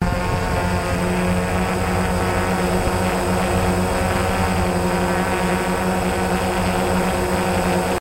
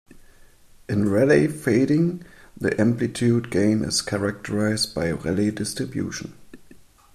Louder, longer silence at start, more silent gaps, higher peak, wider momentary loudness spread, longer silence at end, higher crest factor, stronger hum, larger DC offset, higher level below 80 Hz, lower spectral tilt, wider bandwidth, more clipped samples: about the same, -20 LUFS vs -22 LUFS; second, 0 s vs 0.15 s; neither; about the same, -6 dBFS vs -6 dBFS; second, 1 LU vs 9 LU; second, 0 s vs 0.35 s; about the same, 14 dB vs 18 dB; neither; neither; first, -30 dBFS vs -52 dBFS; about the same, -5.5 dB/octave vs -5.5 dB/octave; first, 16 kHz vs 14.5 kHz; neither